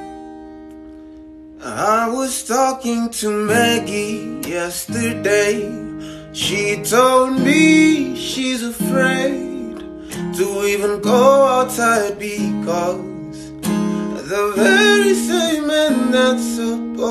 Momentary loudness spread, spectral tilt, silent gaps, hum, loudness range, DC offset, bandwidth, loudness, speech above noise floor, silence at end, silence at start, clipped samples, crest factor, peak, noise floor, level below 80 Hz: 18 LU; -4 dB/octave; none; none; 4 LU; under 0.1%; 14 kHz; -17 LUFS; 22 dB; 0 s; 0 s; under 0.1%; 16 dB; -2 dBFS; -38 dBFS; -50 dBFS